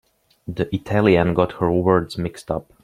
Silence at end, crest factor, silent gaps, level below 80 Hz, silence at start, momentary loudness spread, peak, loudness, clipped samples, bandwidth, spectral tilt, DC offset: 0.2 s; 18 dB; none; -46 dBFS; 0.5 s; 12 LU; -2 dBFS; -20 LUFS; under 0.1%; 13 kHz; -7.5 dB/octave; under 0.1%